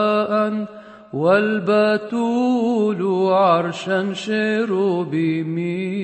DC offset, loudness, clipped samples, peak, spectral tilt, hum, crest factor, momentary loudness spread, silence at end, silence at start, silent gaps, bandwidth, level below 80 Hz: under 0.1%; -19 LUFS; under 0.1%; -4 dBFS; -6.5 dB/octave; none; 16 dB; 7 LU; 0 s; 0 s; none; 8.6 kHz; -70 dBFS